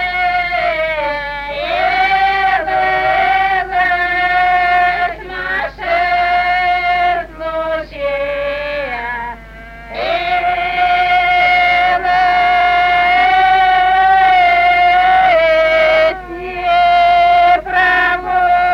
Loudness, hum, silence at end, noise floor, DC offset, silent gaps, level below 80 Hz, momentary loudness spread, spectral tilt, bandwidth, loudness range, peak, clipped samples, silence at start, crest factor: -13 LUFS; none; 0 s; -33 dBFS; under 0.1%; none; -38 dBFS; 10 LU; -4 dB/octave; 6.6 kHz; 7 LU; -2 dBFS; under 0.1%; 0 s; 12 dB